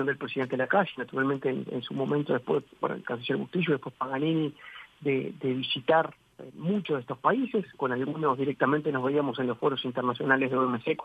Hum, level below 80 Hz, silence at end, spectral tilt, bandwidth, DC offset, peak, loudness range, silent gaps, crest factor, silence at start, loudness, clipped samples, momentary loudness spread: none; -72 dBFS; 0 s; -8 dB/octave; 8.4 kHz; under 0.1%; -8 dBFS; 2 LU; none; 20 dB; 0 s; -29 LUFS; under 0.1%; 8 LU